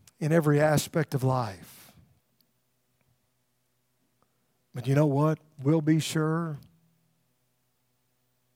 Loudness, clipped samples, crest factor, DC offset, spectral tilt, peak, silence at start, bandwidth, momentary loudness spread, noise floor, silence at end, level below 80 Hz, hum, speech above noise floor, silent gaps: -26 LUFS; under 0.1%; 20 dB; under 0.1%; -6.5 dB/octave; -10 dBFS; 0.2 s; 16.5 kHz; 13 LU; -75 dBFS; 1.95 s; -68 dBFS; none; 49 dB; none